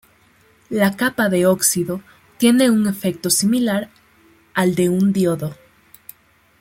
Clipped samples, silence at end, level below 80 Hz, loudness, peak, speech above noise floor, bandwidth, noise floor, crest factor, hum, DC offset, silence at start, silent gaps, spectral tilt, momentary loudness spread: under 0.1%; 1.1 s; -58 dBFS; -18 LUFS; -2 dBFS; 37 dB; 16.5 kHz; -55 dBFS; 18 dB; none; under 0.1%; 0.7 s; none; -4.5 dB/octave; 11 LU